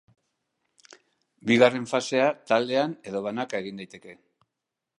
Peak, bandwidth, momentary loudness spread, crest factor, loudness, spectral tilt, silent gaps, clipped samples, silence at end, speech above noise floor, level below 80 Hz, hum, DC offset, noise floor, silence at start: -4 dBFS; 11 kHz; 17 LU; 24 dB; -25 LUFS; -4.5 dB/octave; none; under 0.1%; 0.85 s; 61 dB; -74 dBFS; none; under 0.1%; -86 dBFS; 1.45 s